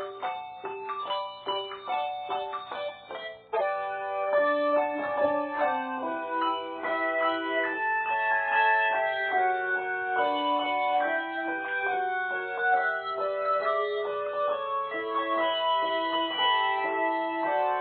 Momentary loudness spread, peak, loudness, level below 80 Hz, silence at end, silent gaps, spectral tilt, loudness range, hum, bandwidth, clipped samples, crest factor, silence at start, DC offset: 8 LU; -12 dBFS; -28 LUFS; -76 dBFS; 0 s; none; 1 dB/octave; 5 LU; none; 4.6 kHz; under 0.1%; 16 dB; 0 s; under 0.1%